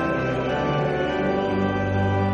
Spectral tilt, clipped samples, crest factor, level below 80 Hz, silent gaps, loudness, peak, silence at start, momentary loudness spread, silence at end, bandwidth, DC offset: -7.5 dB/octave; under 0.1%; 12 dB; -44 dBFS; none; -23 LUFS; -10 dBFS; 0 s; 1 LU; 0 s; 7.4 kHz; under 0.1%